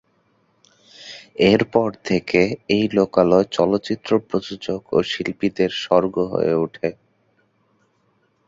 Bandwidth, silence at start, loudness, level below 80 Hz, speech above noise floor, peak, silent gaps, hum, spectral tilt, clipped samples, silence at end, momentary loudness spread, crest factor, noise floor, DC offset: 7.8 kHz; 1 s; -20 LUFS; -54 dBFS; 45 dB; -2 dBFS; none; none; -6 dB/octave; under 0.1%; 1.55 s; 11 LU; 20 dB; -64 dBFS; under 0.1%